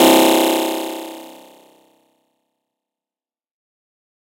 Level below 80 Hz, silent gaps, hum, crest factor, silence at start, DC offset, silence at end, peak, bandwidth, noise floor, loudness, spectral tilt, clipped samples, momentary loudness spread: -70 dBFS; none; none; 20 dB; 0 s; under 0.1%; 2.9 s; 0 dBFS; 16.5 kHz; under -90 dBFS; -15 LUFS; -2.5 dB/octave; under 0.1%; 22 LU